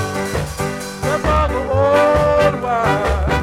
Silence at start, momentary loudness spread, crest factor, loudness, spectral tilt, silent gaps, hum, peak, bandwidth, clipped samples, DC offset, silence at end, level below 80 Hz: 0 s; 10 LU; 16 dB; -17 LUFS; -5.5 dB/octave; none; none; 0 dBFS; 16 kHz; under 0.1%; under 0.1%; 0 s; -26 dBFS